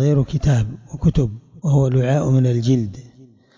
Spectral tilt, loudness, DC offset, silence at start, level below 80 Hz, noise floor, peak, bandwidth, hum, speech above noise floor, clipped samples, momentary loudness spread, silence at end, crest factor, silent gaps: -8 dB/octave; -19 LUFS; under 0.1%; 0 s; -36 dBFS; -48 dBFS; -6 dBFS; 7.6 kHz; none; 31 dB; under 0.1%; 9 LU; 0.5 s; 12 dB; none